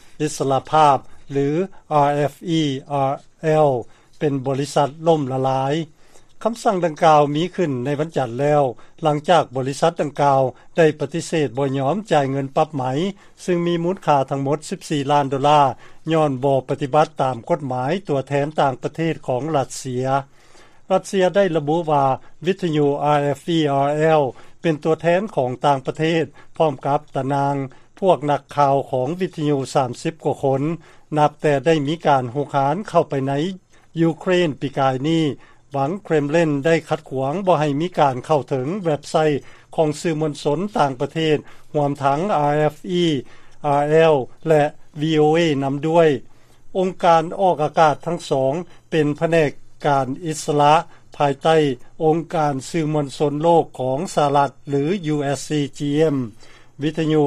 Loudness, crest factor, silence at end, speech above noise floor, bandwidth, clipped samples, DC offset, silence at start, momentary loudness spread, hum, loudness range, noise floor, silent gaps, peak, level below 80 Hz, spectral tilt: -20 LUFS; 18 dB; 0 s; 26 dB; 13 kHz; under 0.1%; under 0.1%; 0.05 s; 8 LU; none; 3 LU; -45 dBFS; none; -2 dBFS; -52 dBFS; -6.5 dB/octave